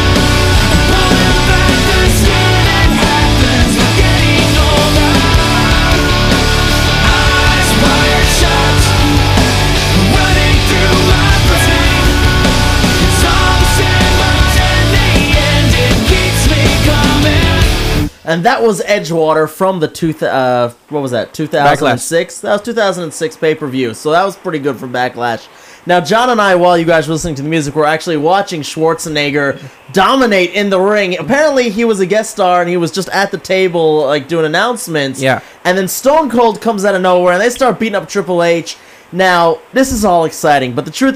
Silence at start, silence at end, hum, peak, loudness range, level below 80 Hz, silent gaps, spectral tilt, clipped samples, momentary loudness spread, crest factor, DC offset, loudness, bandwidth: 0 s; 0 s; none; 0 dBFS; 4 LU; -18 dBFS; none; -4.5 dB/octave; under 0.1%; 7 LU; 10 dB; under 0.1%; -11 LUFS; 16 kHz